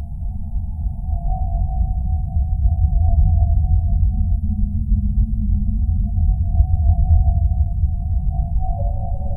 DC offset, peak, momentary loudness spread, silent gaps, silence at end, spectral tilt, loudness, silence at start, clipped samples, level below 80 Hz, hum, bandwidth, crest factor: under 0.1%; -2 dBFS; 8 LU; none; 0 s; -15 dB/octave; -21 LUFS; 0 s; under 0.1%; -18 dBFS; none; 0.9 kHz; 16 dB